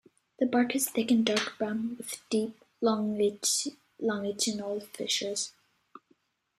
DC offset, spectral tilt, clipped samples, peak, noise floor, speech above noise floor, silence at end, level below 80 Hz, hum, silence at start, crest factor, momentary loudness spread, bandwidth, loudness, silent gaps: under 0.1%; -3 dB/octave; under 0.1%; -10 dBFS; -70 dBFS; 41 dB; 1.1 s; -74 dBFS; none; 0.4 s; 22 dB; 9 LU; 16 kHz; -30 LUFS; none